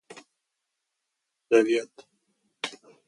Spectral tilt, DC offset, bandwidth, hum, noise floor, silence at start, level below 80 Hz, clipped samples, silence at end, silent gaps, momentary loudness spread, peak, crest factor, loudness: -3.5 dB/octave; under 0.1%; 11.5 kHz; none; -82 dBFS; 1.5 s; -84 dBFS; under 0.1%; 0.3 s; none; 14 LU; -8 dBFS; 22 dB; -26 LUFS